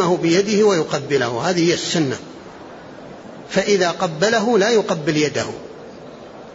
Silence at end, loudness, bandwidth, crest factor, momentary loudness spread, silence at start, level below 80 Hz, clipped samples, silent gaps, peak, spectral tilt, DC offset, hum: 0 s; -18 LUFS; 8 kHz; 14 dB; 22 LU; 0 s; -58 dBFS; under 0.1%; none; -4 dBFS; -4.5 dB/octave; under 0.1%; none